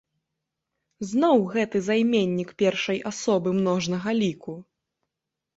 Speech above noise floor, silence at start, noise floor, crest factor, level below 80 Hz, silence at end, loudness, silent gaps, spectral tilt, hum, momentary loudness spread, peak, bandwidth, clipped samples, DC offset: 62 dB; 1 s; -85 dBFS; 18 dB; -66 dBFS; 0.95 s; -24 LUFS; none; -5.5 dB/octave; none; 10 LU; -8 dBFS; 8 kHz; under 0.1%; under 0.1%